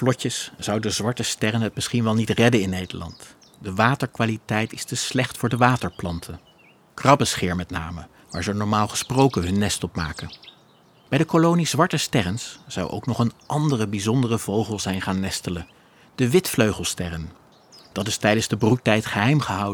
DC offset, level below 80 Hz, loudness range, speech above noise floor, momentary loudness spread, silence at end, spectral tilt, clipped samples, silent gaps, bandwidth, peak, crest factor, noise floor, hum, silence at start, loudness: under 0.1%; -48 dBFS; 2 LU; 32 dB; 14 LU; 0 s; -5 dB/octave; under 0.1%; none; 19 kHz; -2 dBFS; 22 dB; -55 dBFS; none; 0 s; -22 LUFS